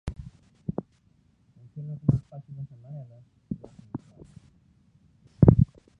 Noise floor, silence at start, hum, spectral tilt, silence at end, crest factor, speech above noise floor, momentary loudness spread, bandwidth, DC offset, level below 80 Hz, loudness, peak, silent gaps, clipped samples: -64 dBFS; 0.05 s; none; -11.5 dB/octave; 0.35 s; 28 dB; 32 dB; 25 LU; 3.1 kHz; under 0.1%; -42 dBFS; -25 LUFS; -2 dBFS; none; under 0.1%